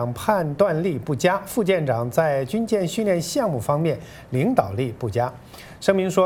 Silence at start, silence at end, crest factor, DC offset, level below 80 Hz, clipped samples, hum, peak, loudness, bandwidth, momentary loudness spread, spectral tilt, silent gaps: 0 s; 0 s; 20 dB; under 0.1%; -52 dBFS; under 0.1%; none; -2 dBFS; -22 LUFS; 17.5 kHz; 6 LU; -6 dB/octave; none